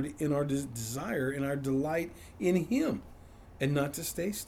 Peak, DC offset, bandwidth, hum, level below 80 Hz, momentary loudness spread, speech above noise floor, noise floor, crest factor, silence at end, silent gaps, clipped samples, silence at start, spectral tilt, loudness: -16 dBFS; under 0.1%; over 20 kHz; none; -56 dBFS; 6 LU; 20 dB; -51 dBFS; 16 dB; 0 s; none; under 0.1%; 0 s; -5.5 dB/octave; -32 LUFS